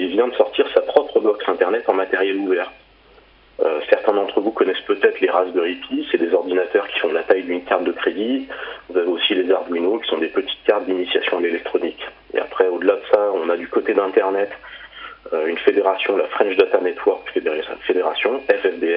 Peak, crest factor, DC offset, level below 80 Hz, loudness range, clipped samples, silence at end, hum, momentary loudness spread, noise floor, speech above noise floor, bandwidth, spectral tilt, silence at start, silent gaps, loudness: 0 dBFS; 18 dB; under 0.1%; -60 dBFS; 1 LU; under 0.1%; 0 s; none; 8 LU; -50 dBFS; 31 dB; 5.4 kHz; -8.5 dB/octave; 0 s; none; -19 LUFS